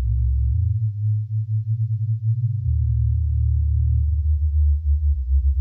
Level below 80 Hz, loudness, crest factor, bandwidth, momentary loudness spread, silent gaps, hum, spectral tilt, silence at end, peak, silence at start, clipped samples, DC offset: -22 dBFS; -22 LUFS; 8 dB; 0.2 kHz; 3 LU; none; none; -12.5 dB/octave; 0 s; -12 dBFS; 0 s; under 0.1%; under 0.1%